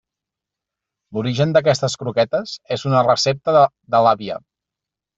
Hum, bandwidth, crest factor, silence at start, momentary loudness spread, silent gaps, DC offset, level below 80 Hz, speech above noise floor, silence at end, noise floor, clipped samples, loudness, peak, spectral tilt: none; 8 kHz; 18 dB; 1.1 s; 10 LU; none; under 0.1%; -58 dBFS; 68 dB; 0.8 s; -86 dBFS; under 0.1%; -18 LUFS; -2 dBFS; -5 dB/octave